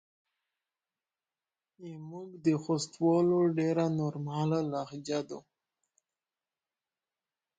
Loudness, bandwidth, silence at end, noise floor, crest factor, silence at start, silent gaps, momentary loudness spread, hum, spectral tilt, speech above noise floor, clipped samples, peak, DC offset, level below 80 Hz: -31 LUFS; 9.2 kHz; 2.2 s; under -90 dBFS; 18 dB; 1.8 s; none; 18 LU; none; -7 dB/octave; over 59 dB; under 0.1%; -16 dBFS; under 0.1%; -76 dBFS